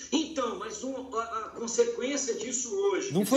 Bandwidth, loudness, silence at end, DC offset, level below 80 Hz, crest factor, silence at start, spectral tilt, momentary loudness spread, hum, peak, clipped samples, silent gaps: 16 kHz; -31 LUFS; 0 s; under 0.1%; -66 dBFS; 18 dB; 0 s; -3.5 dB/octave; 8 LU; none; -12 dBFS; under 0.1%; none